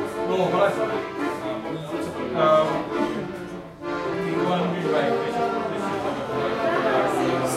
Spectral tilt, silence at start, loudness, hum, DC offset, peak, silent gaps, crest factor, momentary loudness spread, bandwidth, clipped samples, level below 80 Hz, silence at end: -5.5 dB/octave; 0 s; -24 LUFS; none; under 0.1%; -6 dBFS; none; 16 dB; 9 LU; 15.5 kHz; under 0.1%; -56 dBFS; 0 s